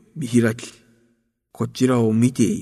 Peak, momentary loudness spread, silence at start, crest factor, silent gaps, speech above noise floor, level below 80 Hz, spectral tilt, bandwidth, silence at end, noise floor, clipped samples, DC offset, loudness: -4 dBFS; 13 LU; 0.15 s; 16 dB; none; 47 dB; -58 dBFS; -6.5 dB/octave; 13.5 kHz; 0 s; -66 dBFS; under 0.1%; under 0.1%; -20 LUFS